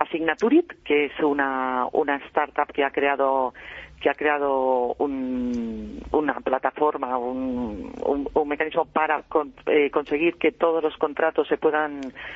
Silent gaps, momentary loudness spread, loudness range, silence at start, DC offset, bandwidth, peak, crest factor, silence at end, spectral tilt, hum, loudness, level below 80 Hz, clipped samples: none; 7 LU; 3 LU; 0 s; under 0.1%; 6.8 kHz; -4 dBFS; 20 dB; 0 s; -6.5 dB/octave; none; -24 LUFS; -52 dBFS; under 0.1%